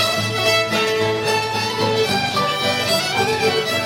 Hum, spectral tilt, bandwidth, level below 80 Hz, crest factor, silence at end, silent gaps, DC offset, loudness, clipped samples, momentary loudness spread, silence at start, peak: none; -3 dB/octave; 16.5 kHz; -54 dBFS; 12 dB; 0 s; none; under 0.1%; -18 LUFS; under 0.1%; 3 LU; 0 s; -6 dBFS